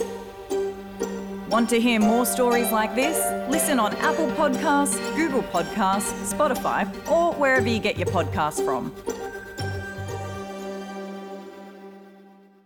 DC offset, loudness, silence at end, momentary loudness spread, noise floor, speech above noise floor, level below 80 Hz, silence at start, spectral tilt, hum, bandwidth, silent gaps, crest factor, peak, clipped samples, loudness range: under 0.1%; -24 LUFS; 0.45 s; 14 LU; -51 dBFS; 28 dB; -52 dBFS; 0 s; -4 dB/octave; none; 19 kHz; none; 12 dB; -12 dBFS; under 0.1%; 10 LU